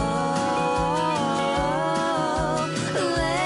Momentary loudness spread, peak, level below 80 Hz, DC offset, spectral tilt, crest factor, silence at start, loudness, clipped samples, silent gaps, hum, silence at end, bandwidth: 2 LU; -12 dBFS; -42 dBFS; under 0.1%; -5 dB/octave; 12 dB; 0 s; -24 LUFS; under 0.1%; none; none; 0 s; 11.5 kHz